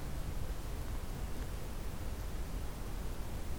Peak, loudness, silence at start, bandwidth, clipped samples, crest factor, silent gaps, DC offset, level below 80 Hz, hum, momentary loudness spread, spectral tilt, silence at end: -28 dBFS; -44 LUFS; 0 s; over 20 kHz; under 0.1%; 12 dB; none; under 0.1%; -40 dBFS; none; 1 LU; -5.5 dB/octave; 0 s